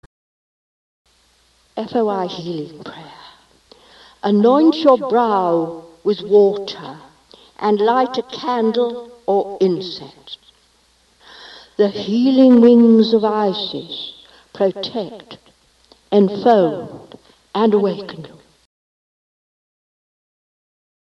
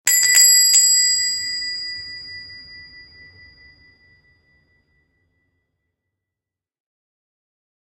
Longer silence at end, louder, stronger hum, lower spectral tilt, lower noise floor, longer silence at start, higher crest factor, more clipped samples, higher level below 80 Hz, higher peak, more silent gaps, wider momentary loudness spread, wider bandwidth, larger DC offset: second, 2.9 s vs 5.15 s; second, -16 LUFS vs -12 LUFS; neither; first, -7.5 dB/octave vs 4.5 dB/octave; second, -57 dBFS vs -87 dBFS; first, 1.75 s vs 0.05 s; about the same, 18 dB vs 22 dB; neither; about the same, -62 dBFS vs -62 dBFS; about the same, 0 dBFS vs 0 dBFS; neither; second, 21 LU vs 25 LU; second, 6.8 kHz vs 16 kHz; neither